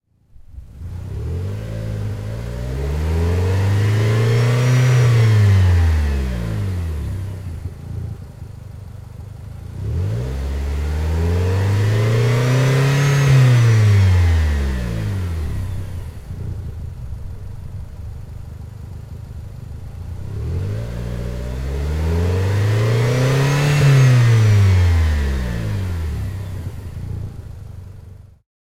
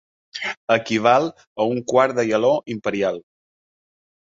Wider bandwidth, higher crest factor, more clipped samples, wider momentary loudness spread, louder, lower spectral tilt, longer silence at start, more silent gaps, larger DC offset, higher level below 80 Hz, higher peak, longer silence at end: first, 15 kHz vs 7.8 kHz; second, 14 dB vs 20 dB; neither; first, 20 LU vs 11 LU; about the same, -18 LUFS vs -20 LUFS; first, -6.5 dB/octave vs -5 dB/octave; first, 0.5 s vs 0.35 s; second, none vs 0.57-0.68 s, 1.47-1.56 s; neither; first, -30 dBFS vs -64 dBFS; about the same, -4 dBFS vs -2 dBFS; second, 0.35 s vs 1.05 s